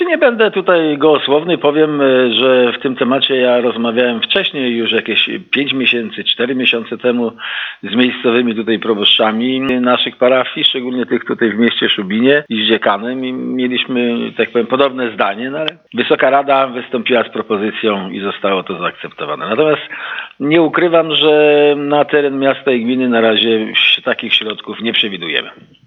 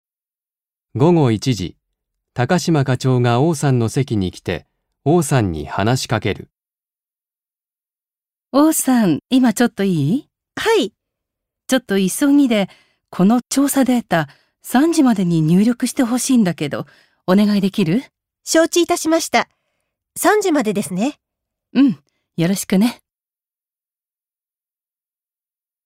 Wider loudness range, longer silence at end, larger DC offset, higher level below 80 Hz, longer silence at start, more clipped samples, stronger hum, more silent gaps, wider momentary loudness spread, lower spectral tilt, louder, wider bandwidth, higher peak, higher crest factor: about the same, 4 LU vs 5 LU; second, 0.35 s vs 2.9 s; neither; second, -62 dBFS vs -52 dBFS; second, 0 s vs 0.95 s; neither; neither; neither; second, 9 LU vs 12 LU; first, -7 dB/octave vs -5.5 dB/octave; first, -13 LUFS vs -17 LUFS; second, 5.8 kHz vs 16 kHz; about the same, 0 dBFS vs 0 dBFS; about the same, 14 dB vs 18 dB